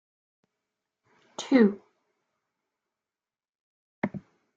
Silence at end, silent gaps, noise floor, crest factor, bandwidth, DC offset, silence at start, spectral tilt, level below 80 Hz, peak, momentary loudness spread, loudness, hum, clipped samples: 0.35 s; 3.49-4.02 s; under -90 dBFS; 24 dB; 7.8 kHz; under 0.1%; 1.4 s; -6 dB/octave; -74 dBFS; -8 dBFS; 22 LU; -26 LUFS; none; under 0.1%